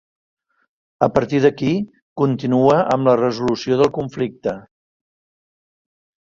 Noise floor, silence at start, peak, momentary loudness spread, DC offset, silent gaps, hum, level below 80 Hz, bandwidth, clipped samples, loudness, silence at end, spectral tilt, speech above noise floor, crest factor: under -90 dBFS; 1 s; -2 dBFS; 10 LU; under 0.1%; 2.02-2.16 s; none; -54 dBFS; 7.6 kHz; under 0.1%; -18 LUFS; 1.6 s; -7.5 dB/octave; over 73 dB; 18 dB